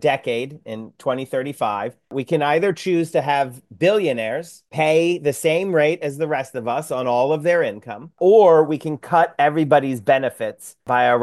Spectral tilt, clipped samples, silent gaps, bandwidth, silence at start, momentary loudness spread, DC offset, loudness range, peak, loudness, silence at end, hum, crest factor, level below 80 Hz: -5.5 dB/octave; under 0.1%; none; 12.5 kHz; 0 s; 12 LU; under 0.1%; 5 LU; -2 dBFS; -19 LUFS; 0 s; none; 16 dB; -70 dBFS